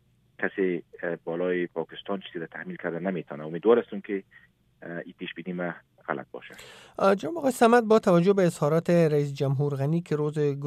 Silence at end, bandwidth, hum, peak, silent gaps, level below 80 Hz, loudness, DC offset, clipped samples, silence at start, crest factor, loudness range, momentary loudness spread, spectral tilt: 0 s; 14.5 kHz; none; -6 dBFS; none; -70 dBFS; -26 LUFS; under 0.1%; under 0.1%; 0.4 s; 20 dB; 9 LU; 17 LU; -7 dB/octave